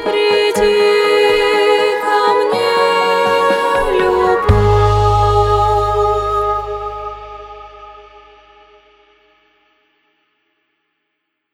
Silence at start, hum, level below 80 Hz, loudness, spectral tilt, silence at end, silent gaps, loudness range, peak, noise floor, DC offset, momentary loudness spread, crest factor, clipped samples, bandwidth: 0 s; none; -28 dBFS; -13 LUFS; -5.5 dB/octave; 3.5 s; none; 12 LU; 0 dBFS; -72 dBFS; under 0.1%; 14 LU; 14 dB; under 0.1%; 16 kHz